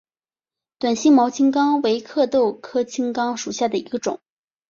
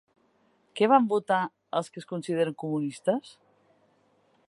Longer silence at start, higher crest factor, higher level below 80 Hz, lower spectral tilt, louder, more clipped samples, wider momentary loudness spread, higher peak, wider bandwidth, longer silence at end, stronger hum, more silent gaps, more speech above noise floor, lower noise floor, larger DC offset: about the same, 0.8 s vs 0.75 s; second, 16 dB vs 22 dB; first, -66 dBFS vs -82 dBFS; second, -4 dB/octave vs -6 dB/octave; first, -20 LUFS vs -27 LUFS; neither; about the same, 11 LU vs 12 LU; about the same, -6 dBFS vs -6 dBFS; second, 7.4 kHz vs 11.5 kHz; second, 0.55 s vs 1.2 s; neither; neither; first, over 71 dB vs 41 dB; first, under -90 dBFS vs -67 dBFS; neither